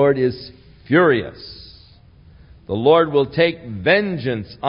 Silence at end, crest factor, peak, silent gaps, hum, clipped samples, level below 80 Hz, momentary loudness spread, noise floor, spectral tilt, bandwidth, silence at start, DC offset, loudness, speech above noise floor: 0 s; 18 dB; -2 dBFS; none; none; under 0.1%; -50 dBFS; 21 LU; -47 dBFS; -11 dB/octave; 5.4 kHz; 0 s; under 0.1%; -18 LUFS; 30 dB